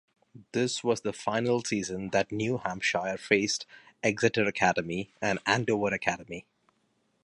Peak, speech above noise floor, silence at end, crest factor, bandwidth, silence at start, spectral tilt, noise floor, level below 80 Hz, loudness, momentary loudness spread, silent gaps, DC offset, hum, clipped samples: -8 dBFS; 44 dB; 0.8 s; 22 dB; 11.5 kHz; 0.35 s; -4 dB/octave; -73 dBFS; -62 dBFS; -29 LUFS; 8 LU; none; under 0.1%; none; under 0.1%